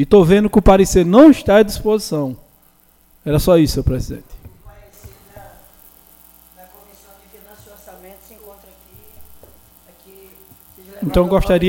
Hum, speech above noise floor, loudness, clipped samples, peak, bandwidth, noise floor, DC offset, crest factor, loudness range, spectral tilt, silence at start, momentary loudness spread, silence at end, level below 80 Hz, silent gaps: none; 41 dB; -13 LUFS; under 0.1%; 0 dBFS; 17 kHz; -53 dBFS; under 0.1%; 16 dB; 16 LU; -6.5 dB/octave; 0 s; 18 LU; 0 s; -32 dBFS; none